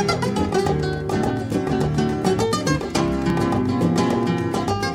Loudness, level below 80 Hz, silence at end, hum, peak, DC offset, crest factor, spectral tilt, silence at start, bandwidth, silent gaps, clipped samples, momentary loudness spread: -21 LUFS; -38 dBFS; 0 s; none; -6 dBFS; under 0.1%; 14 dB; -6 dB/octave; 0 s; 16 kHz; none; under 0.1%; 3 LU